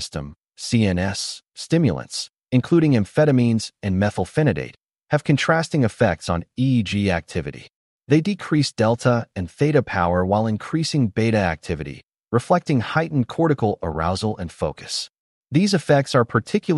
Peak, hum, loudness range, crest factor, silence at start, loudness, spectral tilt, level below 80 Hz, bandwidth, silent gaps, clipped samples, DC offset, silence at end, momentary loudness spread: -4 dBFS; none; 2 LU; 16 dB; 0 s; -21 LUFS; -6 dB/octave; -46 dBFS; 11.5 kHz; 4.85-4.89 s, 7.75-7.99 s, 12.20-12.24 s, 15.19-15.42 s; under 0.1%; under 0.1%; 0 s; 11 LU